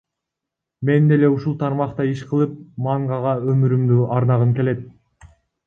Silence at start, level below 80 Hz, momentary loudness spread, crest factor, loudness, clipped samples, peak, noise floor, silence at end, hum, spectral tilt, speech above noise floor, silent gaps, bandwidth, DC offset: 0.8 s; -56 dBFS; 8 LU; 16 dB; -19 LUFS; under 0.1%; -4 dBFS; -83 dBFS; 0.4 s; none; -10 dB/octave; 66 dB; none; 6.6 kHz; under 0.1%